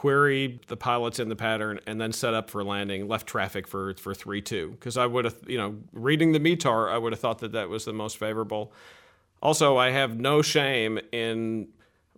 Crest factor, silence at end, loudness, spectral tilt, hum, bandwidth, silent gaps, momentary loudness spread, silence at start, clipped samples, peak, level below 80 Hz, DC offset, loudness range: 18 dB; 0.5 s; -27 LUFS; -4.5 dB/octave; none; 18 kHz; none; 12 LU; 0 s; under 0.1%; -8 dBFS; -64 dBFS; under 0.1%; 5 LU